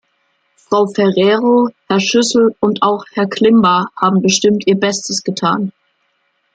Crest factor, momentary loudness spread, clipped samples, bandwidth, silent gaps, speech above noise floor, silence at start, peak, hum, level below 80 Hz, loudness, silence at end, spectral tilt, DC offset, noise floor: 14 dB; 7 LU; under 0.1%; 9.4 kHz; none; 50 dB; 0.7 s; 0 dBFS; none; -58 dBFS; -13 LUFS; 0.85 s; -4.5 dB/octave; under 0.1%; -63 dBFS